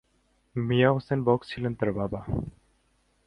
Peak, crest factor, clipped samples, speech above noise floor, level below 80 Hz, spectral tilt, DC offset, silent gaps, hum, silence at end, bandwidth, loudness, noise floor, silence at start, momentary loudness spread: -8 dBFS; 20 dB; under 0.1%; 42 dB; -50 dBFS; -9 dB/octave; under 0.1%; none; none; 0.75 s; 9.2 kHz; -27 LUFS; -68 dBFS; 0.55 s; 11 LU